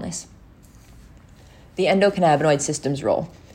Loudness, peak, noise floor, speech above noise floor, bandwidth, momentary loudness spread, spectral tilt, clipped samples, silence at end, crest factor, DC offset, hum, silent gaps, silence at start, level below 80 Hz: -20 LUFS; -4 dBFS; -48 dBFS; 28 dB; 16 kHz; 14 LU; -5 dB/octave; under 0.1%; 0.3 s; 18 dB; under 0.1%; none; none; 0 s; -52 dBFS